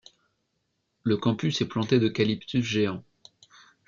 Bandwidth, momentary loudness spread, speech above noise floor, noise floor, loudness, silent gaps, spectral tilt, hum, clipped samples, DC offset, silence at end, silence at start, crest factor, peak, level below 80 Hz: 7.4 kHz; 6 LU; 51 dB; -77 dBFS; -26 LUFS; none; -6 dB/octave; none; under 0.1%; under 0.1%; 0.85 s; 1.05 s; 20 dB; -8 dBFS; -64 dBFS